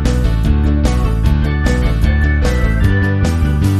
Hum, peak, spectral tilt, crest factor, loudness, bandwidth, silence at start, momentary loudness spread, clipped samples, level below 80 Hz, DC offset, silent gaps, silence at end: none; 0 dBFS; -7 dB/octave; 12 dB; -15 LUFS; 13 kHz; 0 s; 1 LU; under 0.1%; -14 dBFS; under 0.1%; none; 0 s